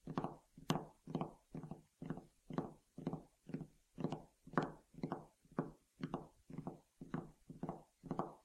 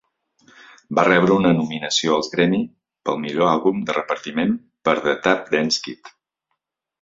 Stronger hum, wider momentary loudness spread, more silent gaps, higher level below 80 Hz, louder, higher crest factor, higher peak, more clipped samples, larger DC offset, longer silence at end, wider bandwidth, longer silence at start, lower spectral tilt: neither; about the same, 11 LU vs 9 LU; neither; second, -70 dBFS vs -58 dBFS; second, -48 LUFS vs -20 LUFS; first, 30 dB vs 20 dB; second, -18 dBFS vs -2 dBFS; neither; neither; second, 0.05 s vs 0.95 s; first, 14.5 kHz vs 7.8 kHz; second, 0.05 s vs 0.9 s; first, -7 dB/octave vs -4.5 dB/octave